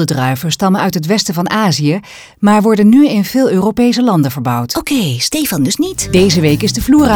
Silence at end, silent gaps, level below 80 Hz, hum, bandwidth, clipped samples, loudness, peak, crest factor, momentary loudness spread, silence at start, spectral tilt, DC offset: 0 s; none; -36 dBFS; none; over 20 kHz; under 0.1%; -12 LUFS; 0 dBFS; 12 dB; 6 LU; 0 s; -5 dB/octave; under 0.1%